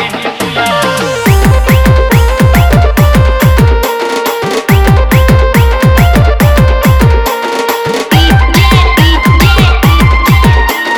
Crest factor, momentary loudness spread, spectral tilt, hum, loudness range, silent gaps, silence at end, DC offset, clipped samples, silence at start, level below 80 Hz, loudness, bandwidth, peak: 6 dB; 6 LU; -5.5 dB/octave; none; 1 LU; none; 0 s; under 0.1%; 0.3%; 0 s; -12 dBFS; -8 LUFS; over 20 kHz; 0 dBFS